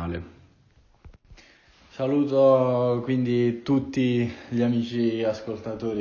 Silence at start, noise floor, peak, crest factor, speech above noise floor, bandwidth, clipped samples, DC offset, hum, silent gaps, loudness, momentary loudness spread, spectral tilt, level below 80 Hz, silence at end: 0 s; -59 dBFS; -8 dBFS; 16 dB; 35 dB; 7 kHz; under 0.1%; under 0.1%; none; none; -24 LUFS; 13 LU; -8 dB/octave; -52 dBFS; 0 s